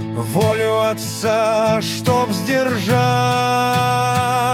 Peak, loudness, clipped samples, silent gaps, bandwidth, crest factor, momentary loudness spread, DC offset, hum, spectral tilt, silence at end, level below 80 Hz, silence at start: -2 dBFS; -17 LUFS; under 0.1%; none; 17.5 kHz; 14 dB; 3 LU; under 0.1%; none; -5 dB/octave; 0 s; -52 dBFS; 0 s